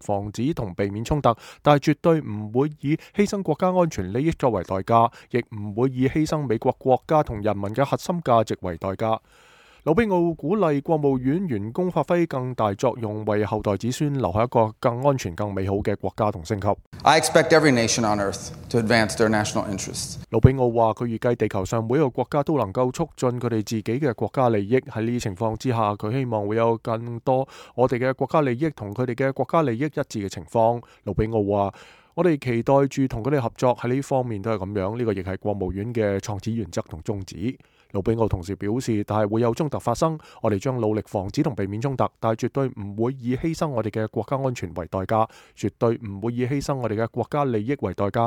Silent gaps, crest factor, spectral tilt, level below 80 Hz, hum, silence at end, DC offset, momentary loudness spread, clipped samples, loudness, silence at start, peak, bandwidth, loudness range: 16.86-16.92 s; 22 dB; -6 dB/octave; -46 dBFS; none; 0 s; under 0.1%; 8 LU; under 0.1%; -24 LUFS; 0 s; -2 dBFS; 17 kHz; 5 LU